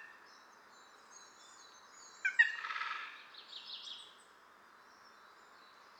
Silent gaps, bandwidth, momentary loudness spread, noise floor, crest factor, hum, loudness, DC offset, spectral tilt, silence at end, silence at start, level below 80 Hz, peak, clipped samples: none; 19.5 kHz; 29 LU; -62 dBFS; 28 dB; none; -36 LUFS; under 0.1%; 2 dB/octave; 0.05 s; 0 s; under -90 dBFS; -16 dBFS; under 0.1%